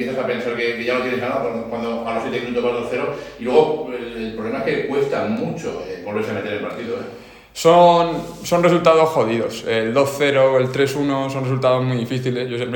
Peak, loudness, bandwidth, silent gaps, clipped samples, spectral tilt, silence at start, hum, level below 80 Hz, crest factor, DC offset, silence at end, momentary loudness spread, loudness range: 0 dBFS; -19 LUFS; 18 kHz; none; under 0.1%; -5.5 dB/octave; 0 s; none; -54 dBFS; 18 dB; under 0.1%; 0 s; 13 LU; 7 LU